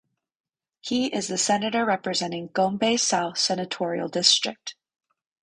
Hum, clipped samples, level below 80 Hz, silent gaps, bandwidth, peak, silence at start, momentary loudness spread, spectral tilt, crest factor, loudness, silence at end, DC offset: none; under 0.1%; -68 dBFS; none; 11 kHz; -4 dBFS; 0.85 s; 10 LU; -2.5 dB/octave; 22 dB; -23 LUFS; 0.7 s; under 0.1%